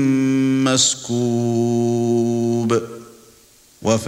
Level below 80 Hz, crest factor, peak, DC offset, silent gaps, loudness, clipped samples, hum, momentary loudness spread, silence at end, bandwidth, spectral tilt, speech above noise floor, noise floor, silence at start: -58 dBFS; 14 dB; -4 dBFS; under 0.1%; none; -18 LUFS; under 0.1%; none; 7 LU; 0 s; 15.5 kHz; -4.5 dB/octave; 33 dB; -51 dBFS; 0 s